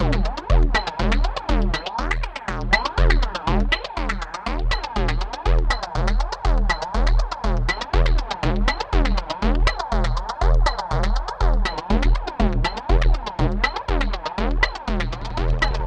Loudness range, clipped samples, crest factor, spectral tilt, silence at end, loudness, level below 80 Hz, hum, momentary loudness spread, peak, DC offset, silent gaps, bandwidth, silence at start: 1 LU; under 0.1%; 16 dB; -5.5 dB/octave; 0 s; -23 LUFS; -22 dBFS; none; 5 LU; -4 dBFS; under 0.1%; none; 8.2 kHz; 0 s